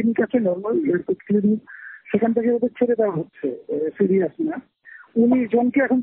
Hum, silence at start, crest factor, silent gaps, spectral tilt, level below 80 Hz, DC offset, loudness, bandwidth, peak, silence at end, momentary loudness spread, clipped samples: none; 0 s; 14 dB; none; -8 dB/octave; -64 dBFS; under 0.1%; -21 LUFS; 3.7 kHz; -6 dBFS; 0 s; 9 LU; under 0.1%